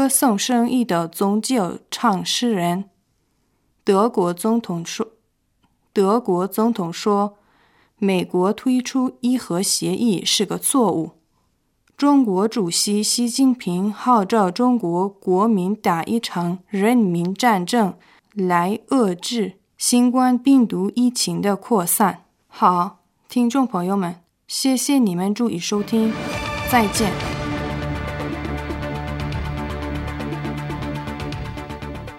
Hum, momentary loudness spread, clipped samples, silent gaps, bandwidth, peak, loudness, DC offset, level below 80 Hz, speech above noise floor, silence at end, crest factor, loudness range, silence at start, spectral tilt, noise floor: none; 11 LU; under 0.1%; none; 16 kHz; -2 dBFS; -20 LUFS; under 0.1%; -42 dBFS; 47 dB; 0 s; 18 dB; 5 LU; 0 s; -4.5 dB/octave; -66 dBFS